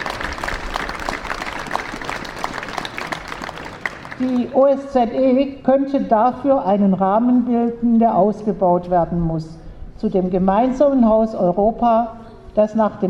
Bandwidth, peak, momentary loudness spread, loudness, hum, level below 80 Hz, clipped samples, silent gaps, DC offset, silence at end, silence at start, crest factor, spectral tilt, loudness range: 12 kHz; -2 dBFS; 12 LU; -18 LUFS; none; -40 dBFS; under 0.1%; none; under 0.1%; 0 s; 0 s; 16 dB; -7 dB/octave; 9 LU